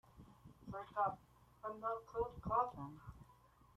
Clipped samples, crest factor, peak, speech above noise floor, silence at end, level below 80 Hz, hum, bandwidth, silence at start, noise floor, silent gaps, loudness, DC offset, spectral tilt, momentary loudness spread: under 0.1%; 22 dB; -22 dBFS; 26 dB; 0.45 s; -64 dBFS; none; 15 kHz; 0.15 s; -68 dBFS; none; -43 LUFS; under 0.1%; -8 dB/octave; 23 LU